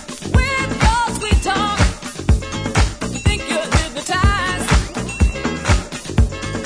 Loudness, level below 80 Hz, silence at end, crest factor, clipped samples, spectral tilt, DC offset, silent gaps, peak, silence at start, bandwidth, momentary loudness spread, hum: -18 LUFS; -22 dBFS; 0 s; 16 dB; under 0.1%; -4.5 dB/octave; under 0.1%; none; -2 dBFS; 0 s; 11 kHz; 4 LU; none